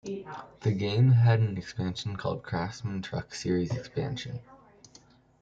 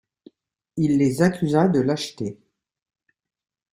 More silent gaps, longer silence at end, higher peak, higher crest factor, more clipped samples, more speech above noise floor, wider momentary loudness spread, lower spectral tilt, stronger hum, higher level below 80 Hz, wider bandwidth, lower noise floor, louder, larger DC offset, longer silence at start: neither; second, 0.85 s vs 1.4 s; second, -12 dBFS vs -4 dBFS; about the same, 18 dB vs 20 dB; neither; about the same, 30 dB vs 33 dB; about the same, 16 LU vs 14 LU; about the same, -7 dB/octave vs -6.5 dB/octave; neither; about the same, -58 dBFS vs -58 dBFS; second, 7.8 kHz vs 15.5 kHz; first, -58 dBFS vs -53 dBFS; second, -29 LUFS vs -21 LUFS; neither; second, 0.05 s vs 0.75 s